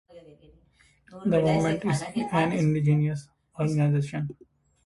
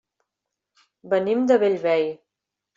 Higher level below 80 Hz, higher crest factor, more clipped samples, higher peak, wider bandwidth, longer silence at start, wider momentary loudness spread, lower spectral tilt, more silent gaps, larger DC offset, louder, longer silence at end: first, -58 dBFS vs -72 dBFS; about the same, 16 dB vs 18 dB; neither; second, -10 dBFS vs -6 dBFS; first, 11.5 kHz vs 7.6 kHz; second, 0.15 s vs 1.05 s; about the same, 11 LU vs 9 LU; about the same, -7.5 dB/octave vs -6.5 dB/octave; neither; neither; second, -26 LUFS vs -21 LUFS; about the same, 0.5 s vs 0.6 s